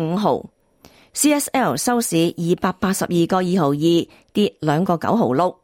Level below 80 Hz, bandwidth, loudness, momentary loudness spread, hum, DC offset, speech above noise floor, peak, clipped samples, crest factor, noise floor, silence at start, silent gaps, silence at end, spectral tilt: -56 dBFS; 16.5 kHz; -19 LUFS; 4 LU; none; under 0.1%; 32 dB; -4 dBFS; under 0.1%; 16 dB; -51 dBFS; 0 s; none; 0.1 s; -5 dB/octave